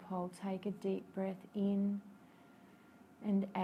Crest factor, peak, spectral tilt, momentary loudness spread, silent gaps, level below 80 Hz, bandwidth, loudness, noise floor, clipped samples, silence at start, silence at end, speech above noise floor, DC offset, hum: 14 dB; -26 dBFS; -8.5 dB/octave; 9 LU; none; -80 dBFS; 10.5 kHz; -39 LUFS; -62 dBFS; under 0.1%; 0 s; 0 s; 24 dB; under 0.1%; none